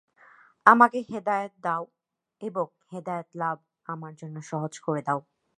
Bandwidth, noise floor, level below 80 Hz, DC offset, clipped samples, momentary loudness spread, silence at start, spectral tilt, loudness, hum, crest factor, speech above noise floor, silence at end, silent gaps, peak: 11 kHz; -57 dBFS; -78 dBFS; under 0.1%; under 0.1%; 20 LU; 0.65 s; -6.5 dB/octave; -26 LUFS; none; 26 dB; 30 dB; 0.35 s; none; -2 dBFS